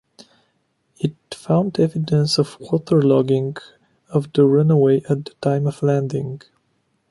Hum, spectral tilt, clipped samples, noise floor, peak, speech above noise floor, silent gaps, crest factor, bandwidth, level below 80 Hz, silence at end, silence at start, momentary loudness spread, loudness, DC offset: none; -7.5 dB/octave; under 0.1%; -67 dBFS; -4 dBFS; 49 dB; none; 16 dB; 11.5 kHz; -60 dBFS; 0.75 s; 1 s; 12 LU; -19 LUFS; under 0.1%